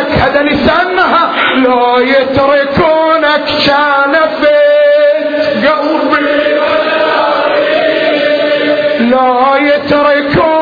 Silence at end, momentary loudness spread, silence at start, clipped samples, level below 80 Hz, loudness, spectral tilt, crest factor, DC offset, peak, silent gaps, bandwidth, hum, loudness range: 0 s; 2 LU; 0 s; under 0.1%; -38 dBFS; -9 LUFS; -6.5 dB/octave; 8 dB; under 0.1%; 0 dBFS; none; 5 kHz; none; 2 LU